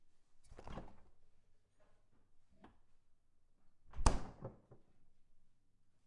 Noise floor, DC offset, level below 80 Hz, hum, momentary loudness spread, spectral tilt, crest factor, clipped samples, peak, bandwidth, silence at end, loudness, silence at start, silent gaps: -69 dBFS; under 0.1%; -50 dBFS; none; 25 LU; -4.5 dB/octave; 36 dB; under 0.1%; -10 dBFS; 11 kHz; 0.65 s; -44 LUFS; 0.05 s; none